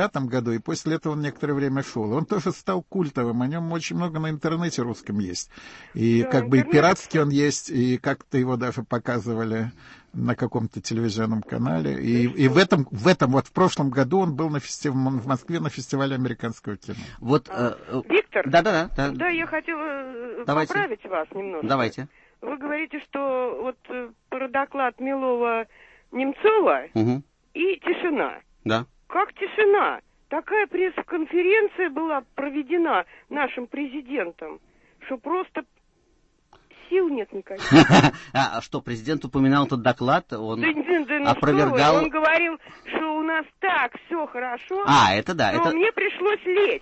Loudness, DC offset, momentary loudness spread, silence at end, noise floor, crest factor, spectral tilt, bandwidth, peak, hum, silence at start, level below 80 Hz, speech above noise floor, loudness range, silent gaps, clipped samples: -23 LUFS; under 0.1%; 12 LU; 0.05 s; -63 dBFS; 20 dB; -6 dB/octave; 8.4 kHz; -2 dBFS; none; 0 s; -52 dBFS; 40 dB; 7 LU; none; under 0.1%